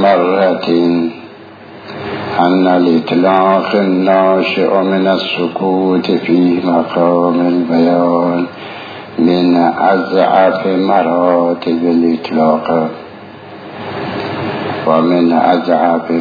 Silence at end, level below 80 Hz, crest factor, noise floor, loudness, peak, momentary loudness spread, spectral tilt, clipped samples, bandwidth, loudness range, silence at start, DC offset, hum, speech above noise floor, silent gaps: 0 s; -58 dBFS; 12 dB; -34 dBFS; -12 LUFS; 0 dBFS; 13 LU; -8.5 dB/octave; under 0.1%; 5 kHz; 4 LU; 0 s; under 0.1%; none; 23 dB; none